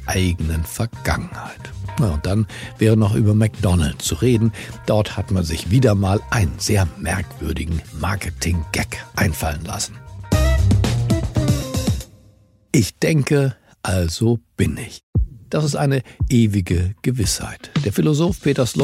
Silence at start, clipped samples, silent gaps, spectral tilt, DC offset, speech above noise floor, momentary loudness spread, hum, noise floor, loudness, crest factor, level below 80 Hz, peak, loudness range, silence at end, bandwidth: 0 s; under 0.1%; 15.03-15.13 s; -5.5 dB/octave; under 0.1%; 33 dB; 9 LU; none; -52 dBFS; -20 LUFS; 18 dB; -30 dBFS; -2 dBFS; 3 LU; 0 s; 16 kHz